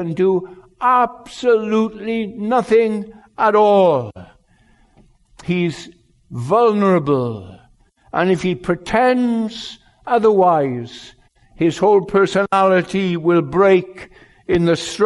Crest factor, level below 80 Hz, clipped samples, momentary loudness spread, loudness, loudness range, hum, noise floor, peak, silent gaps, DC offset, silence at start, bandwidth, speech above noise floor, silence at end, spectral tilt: 14 dB; -50 dBFS; under 0.1%; 18 LU; -17 LUFS; 4 LU; none; -54 dBFS; -4 dBFS; none; under 0.1%; 0 s; 11.5 kHz; 38 dB; 0 s; -6.5 dB/octave